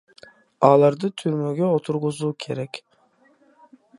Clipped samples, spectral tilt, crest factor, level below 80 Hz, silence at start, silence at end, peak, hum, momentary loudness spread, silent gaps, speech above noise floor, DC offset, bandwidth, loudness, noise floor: under 0.1%; -7 dB/octave; 22 dB; -70 dBFS; 0.6 s; 1.2 s; -2 dBFS; none; 14 LU; none; 39 dB; under 0.1%; 11.5 kHz; -21 LUFS; -60 dBFS